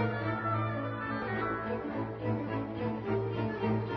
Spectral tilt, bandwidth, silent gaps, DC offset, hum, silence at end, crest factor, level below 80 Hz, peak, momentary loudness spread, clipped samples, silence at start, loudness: -6.5 dB/octave; 5.8 kHz; none; under 0.1%; none; 0 s; 14 dB; -56 dBFS; -20 dBFS; 3 LU; under 0.1%; 0 s; -34 LUFS